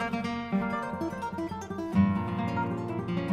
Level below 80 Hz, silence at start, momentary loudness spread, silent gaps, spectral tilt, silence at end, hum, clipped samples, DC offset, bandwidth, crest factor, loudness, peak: -56 dBFS; 0 s; 8 LU; none; -7.5 dB/octave; 0 s; none; under 0.1%; under 0.1%; 11.5 kHz; 18 dB; -31 LUFS; -12 dBFS